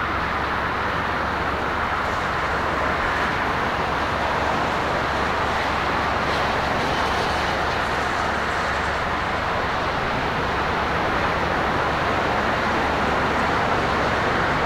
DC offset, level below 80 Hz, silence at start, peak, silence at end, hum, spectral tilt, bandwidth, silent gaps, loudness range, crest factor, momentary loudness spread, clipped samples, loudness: under 0.1%; -36 dBFS; 0 s; -8 dBFS; 0 s; none; -5 dB/octave; 16 kHz; none; 1 LU; 14 dB; 2 LU; under 0.1%; -22 LUFS